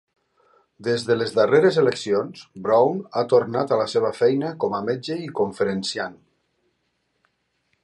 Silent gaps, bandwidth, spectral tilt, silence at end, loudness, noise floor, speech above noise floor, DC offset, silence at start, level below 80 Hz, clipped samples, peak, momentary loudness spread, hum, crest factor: none; 11.5 kHz; -5.5 dB/octave; 1.7 s; -22 LUFS; -72 dBFS; 51 dB; under 0.1%; 0.8 s; -66 dBFS; under 0.1%; -4 dBFS; 10 LU; none; 18 dB